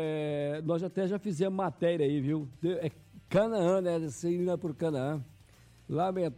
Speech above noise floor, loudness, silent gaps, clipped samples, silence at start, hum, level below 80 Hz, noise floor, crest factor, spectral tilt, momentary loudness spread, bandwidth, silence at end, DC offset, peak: 28 dB; -32 LUFS; none; under 0.1%; 0 s; none; -66 dBFS; -58 dBFS; 14 dB; -7 dB/octave; 7 LU; 14 kHz; 0 s; under 0.1%; -18 dBFS